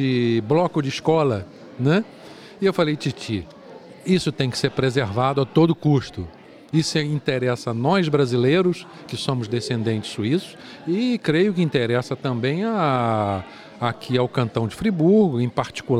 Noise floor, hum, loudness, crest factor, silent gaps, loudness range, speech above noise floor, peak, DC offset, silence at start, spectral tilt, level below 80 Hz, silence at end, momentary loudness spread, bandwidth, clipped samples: -42 dBFS; none; -22 LUFS; 18 dB; none; 2 LU; 21 dB; -4 dBFS; under 0.1%; 0 s; -6.5 dB/octave; -56 dBFS; 0 s; 11 LU; 14 kHz; under 0.1%